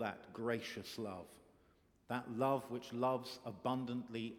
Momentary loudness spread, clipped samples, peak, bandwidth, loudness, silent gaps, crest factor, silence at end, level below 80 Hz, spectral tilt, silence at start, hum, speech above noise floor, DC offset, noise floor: 10 LU; under 0.1%; -24 dBFS; 18 kHz; -42 LUFS; none; 18 dB; 0 s; -78 dBFS; -6 dB/octave; 0 s; none; 30 dB; under 0.1%; -72 dBFS